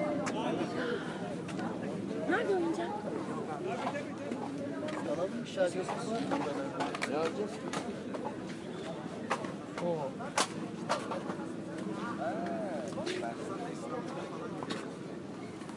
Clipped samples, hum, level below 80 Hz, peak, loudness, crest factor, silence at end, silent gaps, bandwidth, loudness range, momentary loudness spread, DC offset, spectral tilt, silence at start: under 0.1%; none; -72 dBFS; -14 dBFS; -36 LUFS; 22 dB; 0 s; none; 11.5 kHz; 3 LU; 7 LU; under 0.1%; -5 dB/octave; 0 s